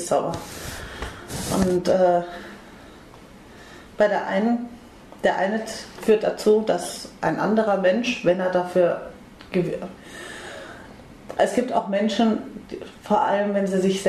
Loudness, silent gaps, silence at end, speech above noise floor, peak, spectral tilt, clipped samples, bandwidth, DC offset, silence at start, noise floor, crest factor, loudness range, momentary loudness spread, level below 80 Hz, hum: -23 LUFS; none; 0 s; 23 dB; -6 dBFS; -5.5 dB/octave; under 0.1%; 13.5 kHz; under 0.1%; 0 s; -45 dBFS; 16 dB; 5 LU; 18 LU; -50 dBFS; none